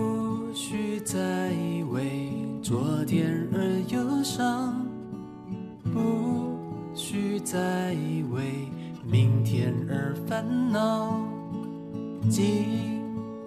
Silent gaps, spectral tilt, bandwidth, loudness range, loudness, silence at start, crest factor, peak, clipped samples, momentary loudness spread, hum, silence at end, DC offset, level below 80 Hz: none; -6 dB/octave; 14 kHz; 3 LU; -28 LUFS; 0 s; 16 dB; -12 dBFS; under 0.1%; 11 LU; none; 0 s; under 0.1%; -62 dBFS